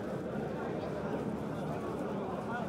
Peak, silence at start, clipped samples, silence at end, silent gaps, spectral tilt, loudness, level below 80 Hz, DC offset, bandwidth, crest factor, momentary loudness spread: -24 dBFS; 0 s; under 0.1%; 0 s; none; -7.5 dB/octave; -38 LUFS; -60 dBFS; under 0.1%; 15.5 kHz; 12 dB; 1 LU